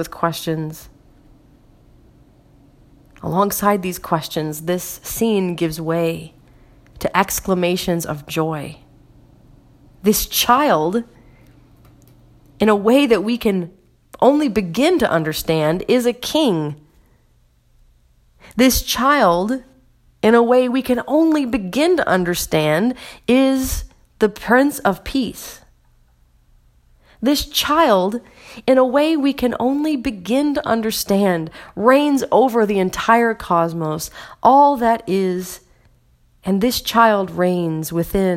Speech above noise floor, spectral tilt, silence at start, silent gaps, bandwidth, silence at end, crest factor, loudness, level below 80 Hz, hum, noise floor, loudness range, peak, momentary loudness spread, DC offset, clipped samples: 39 dB; -4.5 dB/octave; 0 s; none; 16.5 kHz; 0 s; 18 dB; -17 LUFS; -42 dBFS; none; -56 dBFS; 6 LU; 0 dBFS; 11 LU; under 0.1%; under 0.1%